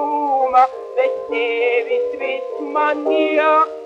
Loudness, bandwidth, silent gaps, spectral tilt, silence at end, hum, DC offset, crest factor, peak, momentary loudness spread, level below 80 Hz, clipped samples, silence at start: -18 LUFS; 7.8 kHz; none; -3.5 dB/octave; 0 s; none; under 0.1%; 16 dB; -2 dBFS; 8 LU; -66 dBFS; under 0.1%; 0 s